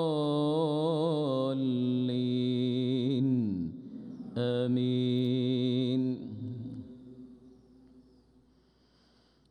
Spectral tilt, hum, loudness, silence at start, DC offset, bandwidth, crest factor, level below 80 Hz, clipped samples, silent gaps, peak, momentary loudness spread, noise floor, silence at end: -8.5 dB/octave; none; -30 LUFS; 0 s; under 0.1%; 9.6 kHz; 12 dB; -70 dBFS; under 0.1%; none; -18 dBFS; 15 LU; -66 dBFS; 1.5 s